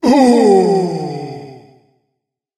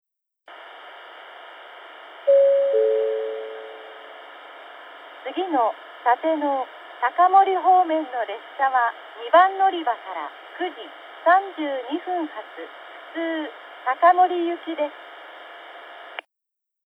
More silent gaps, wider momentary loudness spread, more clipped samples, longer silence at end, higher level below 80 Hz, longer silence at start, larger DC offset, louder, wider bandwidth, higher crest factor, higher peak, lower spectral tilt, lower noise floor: neither; second, 19 LU vs 24 LU; neither; first, 1 s vs 0.65 s; first, -56 dBFS vs under -90 dBFS; second, 0.05 s vs 0.5 s; neither; first, -12 LUFS vs -22 LUFS; first, 12.5 kHz vs 4 kHz; second, 14 dB vs 20 dB; first, 0 dBFS vs -4 dBFS; first, -6.5 dB/octave vs -4 dB/octave; second, -75 dBFS vs -83 dBFS